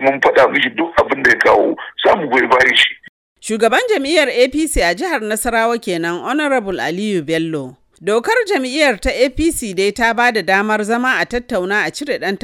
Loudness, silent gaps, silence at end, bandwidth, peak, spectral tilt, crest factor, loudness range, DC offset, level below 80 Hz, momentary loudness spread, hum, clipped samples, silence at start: -15 LUFS; 3.09-3.36 s; 0.05 s; 17.5 kHz; 0 dBFS; -3.5 dB/octave; 16 dB; 4 LU; under 0.1%; -36 dBFS; 8 LU; none; under 0.1%; 0 s